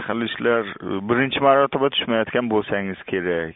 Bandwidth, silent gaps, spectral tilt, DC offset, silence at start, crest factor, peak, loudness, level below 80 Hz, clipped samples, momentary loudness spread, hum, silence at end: 4 kHz; none; -3 dB/octave; under 0.1%; 0 s; 18 dB; -4 dBFS; -21 LUFS; -56 dBFS; under 0.1%; 9 LU; none; 0.05 s